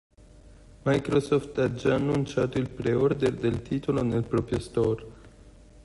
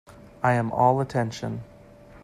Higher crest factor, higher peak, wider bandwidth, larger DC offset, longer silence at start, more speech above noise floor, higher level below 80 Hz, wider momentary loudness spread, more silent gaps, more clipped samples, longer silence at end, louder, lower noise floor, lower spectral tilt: about the same, 18 dB vs 20 dB; second, -10 dBFS vs -6 dBFS; second, 11.5 kHz vs 13 kHz; neither; first, 0.35 s vs 0.15 s; about the same, 25 dB vs 25 dB; first, -48 dBFS vs -56 dBFS; second, 5 LU vs 13 LU; neither; neither; about the same, 0.05 s vs 0.05 s; second, -27 LUFS vs -24 LUFS; about the same, -51 dBFS vs -49 dBFS; about the same, -7.5 dB/octave vs -7 dB/octave